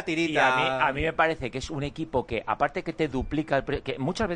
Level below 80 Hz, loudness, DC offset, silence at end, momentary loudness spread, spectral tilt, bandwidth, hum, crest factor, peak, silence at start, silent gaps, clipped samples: -46 dBFS; -27 LUFS; under 0.1%; 0 s; 10 LU; -5.5 dB/octave; 10 kHz; none; 18 dB; -8 dBFS; 0 s; none; under 0.1%